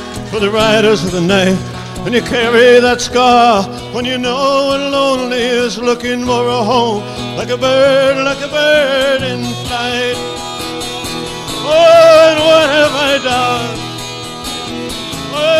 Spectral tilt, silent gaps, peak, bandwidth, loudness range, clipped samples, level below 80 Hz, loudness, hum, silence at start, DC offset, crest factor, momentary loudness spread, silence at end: -4 dB/octave; none; 0 dBFS; 15.5 kHz; 4 LU; under 0.1%; -38 dBFS; -12 LUFS; none; 0 s; under 0.1%; 12 dB; 14 LU; 0 s